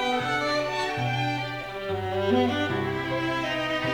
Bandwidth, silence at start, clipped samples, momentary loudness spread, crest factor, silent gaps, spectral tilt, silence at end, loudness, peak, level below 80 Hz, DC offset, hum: over 20 kHz; 0 s; under 0.1%; 7 LU; 16 dB; none; -5.5 dB/octave; 0 s; -27 LUFS; -10 dBFS; -52 dBFS; under 0.1%; none